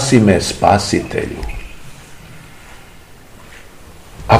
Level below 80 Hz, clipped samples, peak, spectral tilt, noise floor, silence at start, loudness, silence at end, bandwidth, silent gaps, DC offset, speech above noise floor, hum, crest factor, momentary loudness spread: -34 dBFS; 0.2%; 0 dBFS; -5 dB/octave; -41 dBFS; 0 s; -15 LUFS; 0 s; 16 kHz; none; 0.7%; 27 dB; none; 18 dB; 27 LU